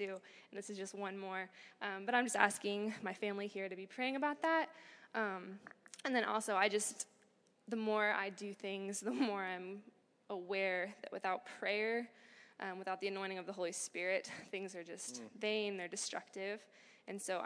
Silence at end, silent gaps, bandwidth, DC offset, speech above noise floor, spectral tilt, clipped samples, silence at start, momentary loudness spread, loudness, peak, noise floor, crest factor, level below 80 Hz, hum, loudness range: 0 s; none; 11 kHz; under 0.1%; 32 dB; -3 dB/octave; under 0.1%; 0 s; 13 LU; -40 LUFS; -14 dBFS; -73 dBFS; 26 dB; under -90 dBFS; none; 4 LU